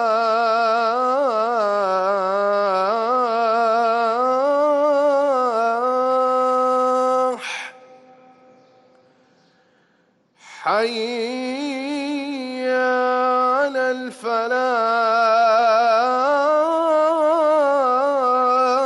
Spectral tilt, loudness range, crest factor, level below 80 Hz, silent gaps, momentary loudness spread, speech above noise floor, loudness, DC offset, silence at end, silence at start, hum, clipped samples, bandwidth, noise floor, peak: -3.5 dB/octave; 10 LU; 10 dB; -72 dBFS; none; 8 LU; 39 dB; -19 LUFS; under 0.1%; 0 s; 0 s; none; under 0.1%; 11.5 kHz; -62 dBFS; -8 dBFS